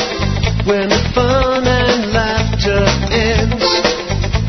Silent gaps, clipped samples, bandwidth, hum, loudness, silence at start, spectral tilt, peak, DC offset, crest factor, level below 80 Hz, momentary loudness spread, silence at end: none; under 0.1%; 6.4 kHz; none; -14 LUFS; 0 s; -5 dB/octave; 0 dBFS; under 0.1%; 14 dB; -22 dBFS; 3 LU; 0 s